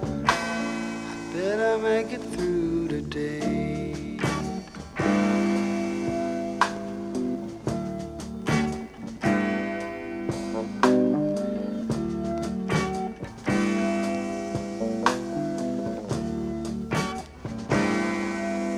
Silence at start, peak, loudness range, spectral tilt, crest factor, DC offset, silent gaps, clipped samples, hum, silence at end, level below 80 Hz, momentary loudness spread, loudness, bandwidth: 0 s; -4 dBFS; 3 LU; -6 dB/octave; 22 dB; under 0.1%; none; under 0.1%; none; 0 s; -48 dBFS; 9 LU; -27 LUFS; 13.5 kHz